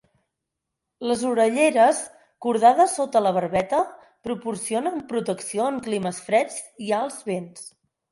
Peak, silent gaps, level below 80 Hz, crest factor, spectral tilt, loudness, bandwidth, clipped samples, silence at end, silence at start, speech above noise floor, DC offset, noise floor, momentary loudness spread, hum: -4 dBFS; none; -64 dBFS; 18 dB; -4.5 dB/octave; -23 LUFS; 11.5 kHz; under 0.1%; 0.45 s; 1 s; 61 dB; under 0.1%; -83 dBFS; 15 LU; none